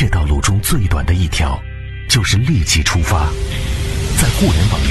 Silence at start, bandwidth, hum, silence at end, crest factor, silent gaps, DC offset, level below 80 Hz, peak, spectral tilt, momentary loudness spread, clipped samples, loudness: 0 s; 12.5 kHz; none; 0 s; 14 dB; none; under 0.1%; -20 dBFS; 0 dBFS; -4 dB/octave; 7 LU; under 0.1%; -15 LUFS